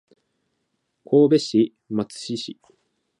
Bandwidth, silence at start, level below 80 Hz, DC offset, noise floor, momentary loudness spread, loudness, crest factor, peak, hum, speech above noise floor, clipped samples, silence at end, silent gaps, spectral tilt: 11 kHz; 1.1 s; -70 dBFS; under 0.1%; -74 dBFS; 14 LU; -21 LUFS; 18 dB; -6 dBFS; none; 54 dB; under 0.1%; 0.7 s; none; -6.5 dB/octave